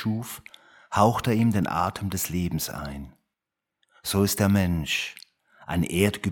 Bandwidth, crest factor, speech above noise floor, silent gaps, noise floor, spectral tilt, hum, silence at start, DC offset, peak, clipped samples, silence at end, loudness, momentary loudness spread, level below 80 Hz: 19 kHz; 20 dB; 61 dB; none; -86 dBFS; -5 dB/octave; none; 0 s; under 0.1%; -6 dBFS; under 0.1%; 0 s; -25 LUFS; 15 LU; -48 dBFS